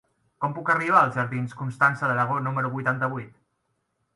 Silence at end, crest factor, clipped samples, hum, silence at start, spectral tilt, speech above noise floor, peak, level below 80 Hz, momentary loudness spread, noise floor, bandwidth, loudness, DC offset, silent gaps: 0.85 s; 22 dB; under 0.1%; none; 0.4 s; -7.5 dB/octave; 51 dB; -4 dBFS; -68 dBFS; 11 LU; -75 dBFS; 11.5 kHz; -24 LUFS; under 0.1%; none